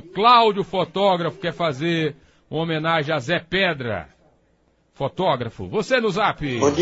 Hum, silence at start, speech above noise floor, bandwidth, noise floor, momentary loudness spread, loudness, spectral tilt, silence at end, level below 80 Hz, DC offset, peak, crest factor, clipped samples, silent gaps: none; 0.05 s; 42 dB; 8 kHz; -62 dBFS; 12 LU; -21 LUFS; -5 dB/octave; 0 s; -52 dBFS; under 0.1%; -2 dBFS; 20 dB; under 0.1%; none